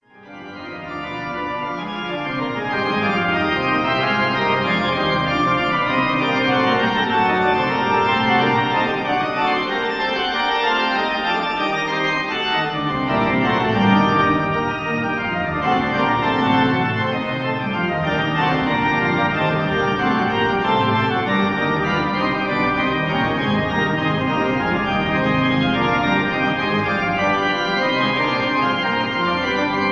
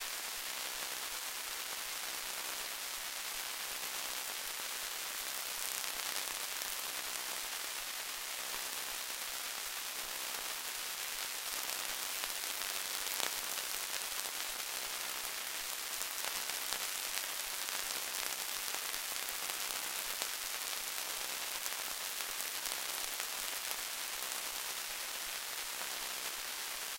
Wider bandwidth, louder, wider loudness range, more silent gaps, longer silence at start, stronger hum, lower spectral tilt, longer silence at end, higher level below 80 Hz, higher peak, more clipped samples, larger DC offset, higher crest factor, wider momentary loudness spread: second, 7.6 kHz vs 17 kHz; first, -19 LUFS vs -38 LUFS; about the same, 2 LU vs 2 LU; neither; first, 0.2 s vs 0 s; neither; first, -6.5 dB/octave vs 2 dB/octave; about the same, 0 s vs 0 s; first, -46 dBFS vs -70 dBFS; first, -4 dBFS vs -12 dBFS; neither; neither; second, 16 dB vs 30 dB; first, 5 LU vs 2 LU